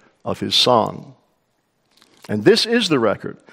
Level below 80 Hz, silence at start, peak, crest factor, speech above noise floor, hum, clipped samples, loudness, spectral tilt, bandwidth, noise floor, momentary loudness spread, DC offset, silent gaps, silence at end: -62 dBFS; 0.25 s; 0 dBFS; 20 dB; 49 dB; none; under 0.1%; -17 LUFS; -4 dB/octave; 16 kHz; -67 dBFS; 14 LU; under 0.1%; none; 0.2 s